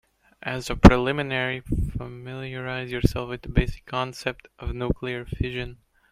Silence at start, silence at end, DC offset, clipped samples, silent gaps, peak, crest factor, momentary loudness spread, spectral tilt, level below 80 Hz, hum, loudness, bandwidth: 0.45 s; 0.4 s; under 0.1%; under 0.1%; none; 0 dBFS; 24 dB; 19 LU; -6.5 dB/octave; -32 dBFS; none; -25 LUFS; 15 kHz